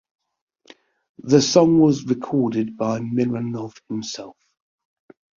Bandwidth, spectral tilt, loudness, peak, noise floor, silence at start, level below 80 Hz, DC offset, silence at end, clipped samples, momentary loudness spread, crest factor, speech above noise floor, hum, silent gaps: 7.4 kHz; -6 dB/octave; -20 LUFS; 0 dBFS; -52 dBFS; 1.25 s; -60 dBFS; under 0.1%; 1.1 s; under 0.1%; 17 LU; 20 dB; 32 dB; none; none